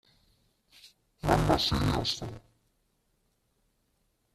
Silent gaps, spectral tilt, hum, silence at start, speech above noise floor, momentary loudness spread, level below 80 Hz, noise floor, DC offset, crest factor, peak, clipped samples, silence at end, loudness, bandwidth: none; -5 dB/octave; none; 0.85 s; 46 dB; 11 LU; -44 dBFS; -74 dBFS; under 0.1%; 26 dB; -8 dBFS; under 0.1%; 1.95 s; -28 LUFS; 14.5 kHz